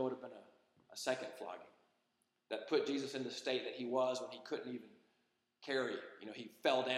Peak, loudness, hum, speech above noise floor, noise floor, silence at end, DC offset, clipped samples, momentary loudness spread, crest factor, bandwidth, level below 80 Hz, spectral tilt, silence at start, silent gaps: -18 dBFS; -41 LUFS; none; 42 dB; -83 dBFS; 0 s; under 0.1%; under 0.1%; 14 LU; 24 dB; 15 kHz; under -90 dBFS; -3.5 dB/octave; 0 s; none